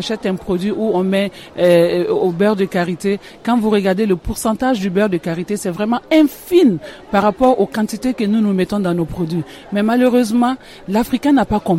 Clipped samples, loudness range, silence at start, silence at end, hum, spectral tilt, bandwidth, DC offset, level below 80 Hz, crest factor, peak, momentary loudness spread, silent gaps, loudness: under 0.1%; 2 LU; 0 s; 0 s; none; -6.5 dB/octave; 16.5 kHz; under 0.1%; -42 dBFS; 14 dB; -2 dBFS; 8 LU; none; -16 LUFS